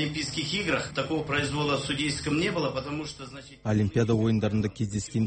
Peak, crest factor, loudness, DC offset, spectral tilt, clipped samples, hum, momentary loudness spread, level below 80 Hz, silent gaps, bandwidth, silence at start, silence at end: -12 dBFS; 16 dB; -28 LUFS; under 0.1%; -5 dB/octave; under 0.1%; none; 10 LU; -50 dBFS; none; 8.8 kHz; 0 s; 0 s